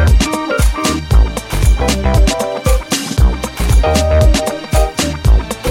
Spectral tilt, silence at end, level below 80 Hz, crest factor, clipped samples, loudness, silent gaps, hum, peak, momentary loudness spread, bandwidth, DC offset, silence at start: -5 dB/octave; 0 s; -14 dBFS; 10 dB; under 0.1%; -14 LUFS; none; none; 0 dBFS; 5 LU; 16.5 kHz; under 0.1%; 0 s